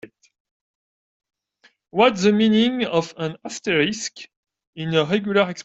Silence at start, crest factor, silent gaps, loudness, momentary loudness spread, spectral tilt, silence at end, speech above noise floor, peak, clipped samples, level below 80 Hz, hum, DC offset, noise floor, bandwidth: 0.05 s; 18 dB; 0.40-0.45 s, 0.51-1.20 s, 4.36-4.43 s, 4.67-4.73 s; -20 LUFS; 13 LU; -5 dB/octave; 0 s; 40 dB; -4 dBFS; under 0.1%; -62 dBFS; none; under 0.1%; -60 dBFS; 8 kHz